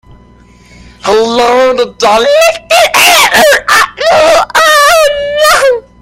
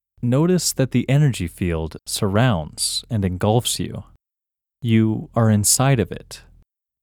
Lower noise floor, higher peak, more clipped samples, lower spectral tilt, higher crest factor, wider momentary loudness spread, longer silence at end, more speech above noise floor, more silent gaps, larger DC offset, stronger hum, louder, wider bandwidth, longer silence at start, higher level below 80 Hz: second, -39 dBFS vs -87 dBFS; first, 0 dBFS vs -4 dBFS; first, 0.7% vs under 0.1%; second, -1 dB/octave vs -5 dB/octave; second, 8 dB vs 16 dB; second, 6 LU vs 12 LU; second, 0.2 s vs 0.65 s; second, 32 dB vs 68 dB; neither; neither; neither; first, -6 LUFS vs -20 LUFS; about the same, over 20 kHz vs 20 kHz; first, 1.05 s vs 0.2 s; first, -38 dBFS vs -44 dBFS